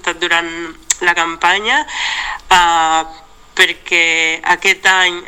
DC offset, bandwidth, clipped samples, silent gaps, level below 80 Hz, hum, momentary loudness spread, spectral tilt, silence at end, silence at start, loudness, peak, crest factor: 0.3%; 18 kHz; under 0.1%; none; -44 dBFS; none; 9 LU; 0 dB/octave; 0.05 s; 0.05 s; -13 LUFS; 0 dBFS; 14 dB